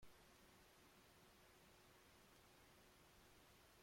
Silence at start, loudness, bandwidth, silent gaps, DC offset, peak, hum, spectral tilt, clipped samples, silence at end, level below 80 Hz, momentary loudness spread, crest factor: 0 s; -69 LUFS; 16.5 kHz; none; under 0.1%; -52 dBFS; none; -3 dB/octave; under 0.1%; 0 s; -80 dBFS; 0 LU; 18 dB